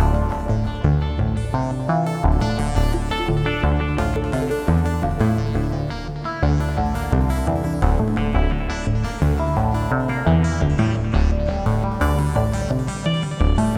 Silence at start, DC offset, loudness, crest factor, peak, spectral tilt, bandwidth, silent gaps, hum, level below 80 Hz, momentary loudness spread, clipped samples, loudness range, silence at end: 0 s; under 0.1%; -21 LUFS; 16 dB; -2 dBFS; -7 dB/octave; 15 kHz; none; none; -24 dBFS; 4 LU; under 0.1%; 1 LU; 0 s